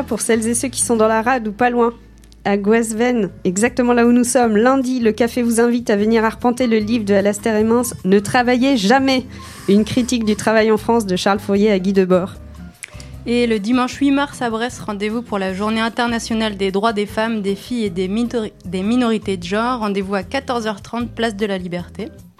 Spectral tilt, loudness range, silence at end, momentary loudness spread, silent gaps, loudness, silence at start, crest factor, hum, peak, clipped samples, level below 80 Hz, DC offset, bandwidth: -4.5 dB/octave; 5 LU; 0.2 s; 9 LU; none; -17 LUFS; 0 s; 16 dB; none; -2 dBFS; under 0.1%; -44 dBFS; under 0.1%; 15 kHz